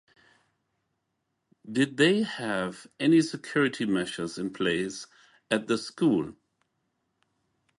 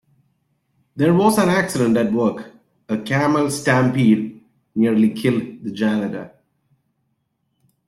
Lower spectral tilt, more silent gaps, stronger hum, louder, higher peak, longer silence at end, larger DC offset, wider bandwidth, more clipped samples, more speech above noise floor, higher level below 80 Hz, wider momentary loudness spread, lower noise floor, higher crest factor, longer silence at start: about the same, -5 dB/octave vs -6 dB/octave; neither; neither; second, -27 LUFS vs -18 LUFS; second, -10 dBFS vs -4 dBFS; second, 1.45 s vs 1.6 s; neither; second, 11.5 kHz vs 13 kHz; neither; about the same, 53 dB vs 53 dB; second, -68 dBFS vs -58 dBFS; second, 11 LU vs 14 LU; first, -80 dBFS vs -71 dBFS; about the same, 20 dB vs 16 dB; first, 1.65 s vs 0.95 s